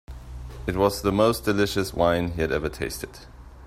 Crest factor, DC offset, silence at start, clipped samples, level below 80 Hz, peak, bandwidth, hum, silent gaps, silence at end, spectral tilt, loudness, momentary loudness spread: 18 dB; under 0.1%; 0.1 s; under 0.1%; -40 dBFS; -6 dBFS; 16 kHz; none; none; 0 s; -5.5 dB/octave; -24 LUFS; 18 LU